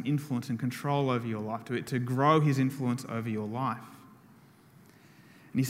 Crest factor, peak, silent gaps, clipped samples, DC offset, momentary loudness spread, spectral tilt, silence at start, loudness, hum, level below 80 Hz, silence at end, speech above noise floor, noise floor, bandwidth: 22 dB; -10 dBFS; none; under 0.1%; under 0.1%; 10 LU; -7 dB/octave; 0 s; -30 LUFS; none; -72 dBFS; 0 s; 28 dB; -57 dBFS; 16 kHz